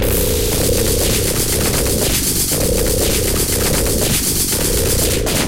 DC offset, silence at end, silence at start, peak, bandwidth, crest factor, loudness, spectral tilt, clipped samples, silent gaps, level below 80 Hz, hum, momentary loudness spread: under 0.1%; 0 s; 0 s; -2 dBFS; 17.5 kHz; 14 dB; -15 LUFS; -3 dB/octave; under 0.1%; none; -24 dBFS; none; 1 LU